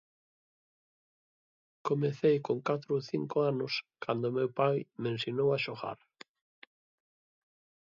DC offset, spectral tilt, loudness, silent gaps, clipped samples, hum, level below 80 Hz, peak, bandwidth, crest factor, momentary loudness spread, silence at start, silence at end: under 0.1%; -7 dB/octave; -32 LUFS; none; under 0.1%; none; -78 dBFS; -14 dBFS; 7.4 kHz; 22 dB; 8 LU; 1.85 s; 1.9 s